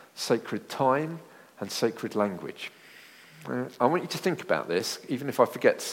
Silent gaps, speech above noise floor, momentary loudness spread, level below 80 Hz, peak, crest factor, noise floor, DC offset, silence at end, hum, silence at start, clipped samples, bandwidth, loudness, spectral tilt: none; 23 dB; 15 LU; -76 dBFS; -6 dBFS; 22 dB; -51 dBFS; under 0.1%; 0 s; none; 0 s; under 0.1%; 16.5 kHz; -28 LUFS; -4.5 dB/octave